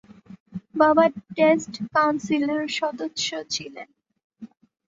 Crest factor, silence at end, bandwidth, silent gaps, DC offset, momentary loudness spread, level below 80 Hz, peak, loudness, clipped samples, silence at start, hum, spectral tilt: 20 dB; 0.4 s; 8 kHz; 0.40-0.46 s, 4.24-4.30 s; under 0.1%; 18 LU; -66 dBFS; -4 dBFS; -22 LUFS; under 0.1%; 0.3 s; none; -4 dB/octave